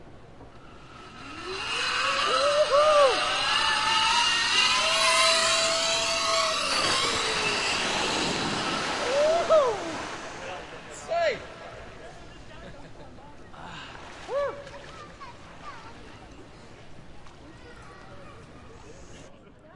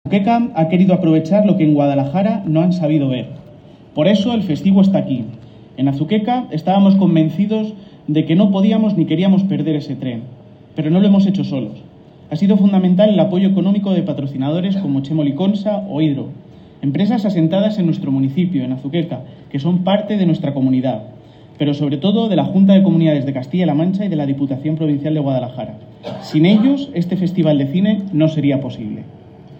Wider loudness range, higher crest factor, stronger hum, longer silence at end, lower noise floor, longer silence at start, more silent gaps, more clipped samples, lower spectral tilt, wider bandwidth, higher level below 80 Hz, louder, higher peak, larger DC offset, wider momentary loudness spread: first, 17 LU vs 3 LU; about the same, 18 dB vs 14 dB; neither; about the same, 0.05 s vs 0 s; first, -49 dBFS vs -40 dBFS; about the same, 0 s vs 0.05 s; neither; neither; second, -1 dB/octave vs -9 dB/octave; first, 11.5 kHz vs 6.2 kHz; about the same, -54 dBFS vs -58 dBFS; second, -23 LUFS vs -16 LUFS; second, -10 dBFS vs -2 dBFS; neither; first, 24 LU vs 12 LU